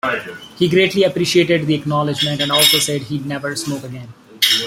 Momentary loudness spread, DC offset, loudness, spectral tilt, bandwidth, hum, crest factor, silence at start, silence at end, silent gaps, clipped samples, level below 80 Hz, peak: 13 LU; under 0.1%; -16 LUFS; -3.5 dB/octave; 16.5 kHz; none; 18 dB; 0.05 s; 0 s; none; under 0.1%; -54 dBFS; 0 dBFS